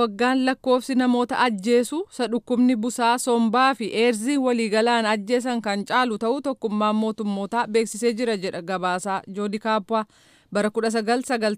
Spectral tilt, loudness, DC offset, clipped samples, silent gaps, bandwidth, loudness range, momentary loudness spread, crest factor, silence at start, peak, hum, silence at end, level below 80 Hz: -4.5 dB/octave; -23 LUFS; under 0.1%; under 0.1%; none; 15.5 kHz; 4 LU; 7 LU; 16 dB; 0 s; -8 dBFS; none; 0 s; -68 dBFS